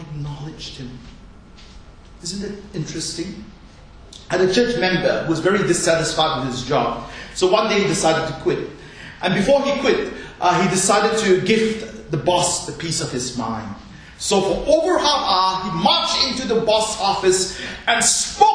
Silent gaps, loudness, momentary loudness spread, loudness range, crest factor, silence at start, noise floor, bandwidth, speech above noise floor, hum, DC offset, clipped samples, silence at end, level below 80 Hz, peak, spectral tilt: none; -19 LUFS; 14 LU; 8 LU; 20 dB; 0 s; -42 dBFS; 10.5 kHz; 23 dB; none; under 0.1%; under 0.1%; 0 s; -44 dBFS; 0 dBFS; -3.5 dB/octave